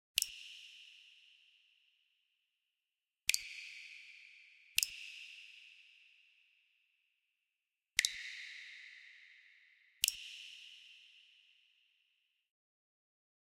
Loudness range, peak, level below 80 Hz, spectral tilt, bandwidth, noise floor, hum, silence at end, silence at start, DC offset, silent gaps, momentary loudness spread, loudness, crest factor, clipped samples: 4 LU; -6 dBFS; -80 dBFS; 5 dB/octave; 16 kHz; under -90 dBFS; none; 2.25 s; 0.15 s; under 0.1%; none; 24 LU; -39 LUFS; 40 dB; under 0.1%